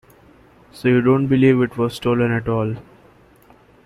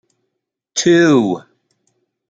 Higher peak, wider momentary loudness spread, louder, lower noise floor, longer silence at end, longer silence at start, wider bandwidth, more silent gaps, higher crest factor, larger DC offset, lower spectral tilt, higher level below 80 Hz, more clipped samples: about the same, -4 dBFS vs -2 dBFS; second, 8 LU vs 13 LU; second, -18 LUFS vs -14 LUFS; second, -50 dBFS vs -77 dBFS; first, 1.05 s vs 0.9 s; about the same, 0.75 s vs 0.75 s; first, 13 kHz vs 9 kHz; neither; about the same, 16 dB vs 16 dB; neither; first, -8 dB/octave vs -4.5 dB/octave; first, -50 dBFS vs -62 dBFS; neither